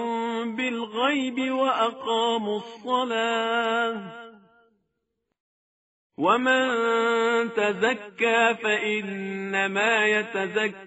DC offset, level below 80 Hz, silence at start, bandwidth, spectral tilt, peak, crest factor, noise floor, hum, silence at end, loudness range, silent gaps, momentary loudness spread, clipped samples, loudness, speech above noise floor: under 0.1%; -76 dBFS; 0 s; 8 kHz; -1.5 dB/octave; -6 dBFS; 18 dB; -79 dBFS; none; 0 s; 6 LU; 5.40-6.10 s; 8 LU; under 0.1%; -24 LUFS; 55 dB